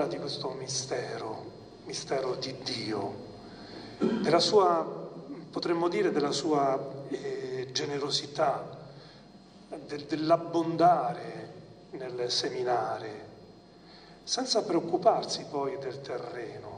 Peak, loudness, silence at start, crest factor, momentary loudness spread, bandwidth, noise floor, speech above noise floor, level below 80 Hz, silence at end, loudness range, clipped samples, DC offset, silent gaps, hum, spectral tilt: -10 dBFS; -30 LUFS; 0 s; 20 dB; 20 LU; 10 kHz; -53 dBFS; 23 dB; -68 dBFS; 0 s; 6 LU; under 0.1%; under 0.1%; none; none; -4 dB/octave